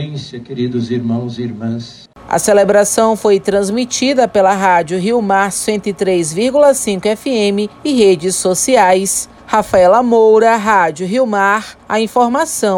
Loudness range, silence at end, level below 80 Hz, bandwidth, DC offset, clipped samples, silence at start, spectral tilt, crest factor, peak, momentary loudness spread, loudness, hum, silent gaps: 3 LU; 0 s; -48 dBFS; 17 kHz; under 0.1%; under 0.1%; 0 s; -4 dB/octave; 12 dB; 0 dBFS; 10 LU; -13 LUFS; none; none